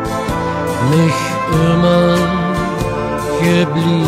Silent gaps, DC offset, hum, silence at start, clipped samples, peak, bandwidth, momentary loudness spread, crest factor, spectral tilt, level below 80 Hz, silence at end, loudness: none; under 0.1%; none; 0 s; under 0.1%; -2 dBFS; 15 kHz; 7 LU; 12 dB; -6.5 dB/octave; -34 dBFS; 0 s; -15 LUFS